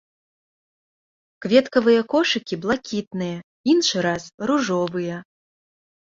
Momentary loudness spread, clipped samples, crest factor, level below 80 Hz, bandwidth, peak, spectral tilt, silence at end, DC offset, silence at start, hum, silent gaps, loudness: 11 LU; under 0.1%; 20 dB; -62 dBFS; 7.8 kHz; -2 dBFS; -4.5 dB/octave; 0.9 s; under 0.1%; 1.4 s; none; 3.07-3.11 s, 3.43-3.64 s, 4.34-4.38 s; -21 LUFS